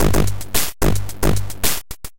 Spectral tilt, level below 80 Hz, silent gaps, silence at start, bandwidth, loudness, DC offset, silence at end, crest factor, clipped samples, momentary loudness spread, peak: -4 dB/octave; -26 dBFS; none; 0 s; 17.5 kHz; -21 LUFS; 10%; 0 s; 16 dB; under 0.1%; 2 LU; -4 dBFS